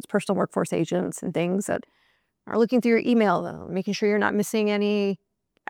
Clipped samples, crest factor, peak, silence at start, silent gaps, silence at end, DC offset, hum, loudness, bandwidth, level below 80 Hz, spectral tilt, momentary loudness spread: under 0.1%; 16 dB; -8 dBFS; 0.1 s; none; 0.55 s; under 0.1%; none; -24 LUFS; 16.5 kHz; -68 dBFS; -5.5 dB/octave; 9 LU